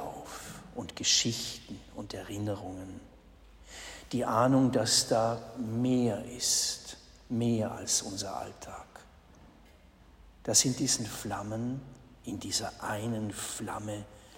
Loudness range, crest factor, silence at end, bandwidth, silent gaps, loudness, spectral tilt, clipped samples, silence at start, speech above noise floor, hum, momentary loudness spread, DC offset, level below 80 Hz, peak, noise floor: 7 LU; 22 dB; 0 s; 16 kHz; none; -30 LUFS; -3.5 dB/octave; under 0.1%; 0 s; 26 dB; none; 19 LU; under 0.1%; -58 dBFS; -10 dBFS; -57 dBFS